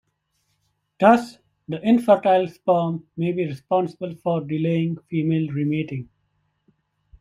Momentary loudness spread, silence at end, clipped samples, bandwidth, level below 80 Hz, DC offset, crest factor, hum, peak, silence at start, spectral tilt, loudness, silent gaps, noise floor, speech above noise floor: 12 LU; 1.15 s; under 0.1%; 11.5 kHz; -62 dBFS; under 0.1%; 20 dB; none; -2 dBFS; 1 s; -8.5 dB/octave; -22 LUFS; none; -71 dBFS; 51 dB